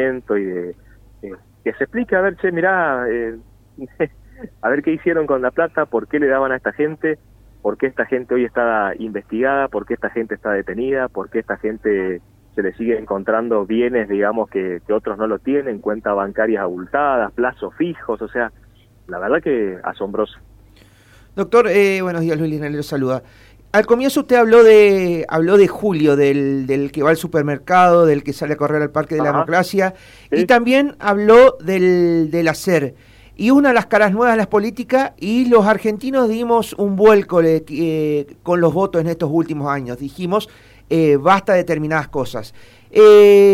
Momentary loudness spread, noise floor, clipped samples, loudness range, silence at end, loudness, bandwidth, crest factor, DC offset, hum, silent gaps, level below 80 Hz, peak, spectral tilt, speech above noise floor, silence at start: 12 LU; -48 dBFS; under 0.1%; 8 LU; 0 s; -16 LUFS; 15.5 kHz; 14 dB; under 0.1%; none; none; -48 dBFS; -2 dBFS; -6.5 dB/octave; 32 dB; 0 s